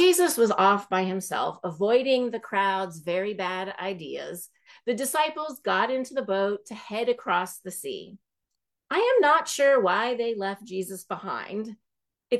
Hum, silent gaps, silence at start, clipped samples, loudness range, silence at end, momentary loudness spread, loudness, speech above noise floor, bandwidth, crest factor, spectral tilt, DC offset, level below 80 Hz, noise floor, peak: none; none; 0 s; under 0.1%; 4 LU; 0 s; 14 LU; -26 LUFS; 59 dB; 13 kHz; 18 dB; -3.5 dB/octave; under 0.1%; -78 dBFS; -85 dBFS; -8 dBFS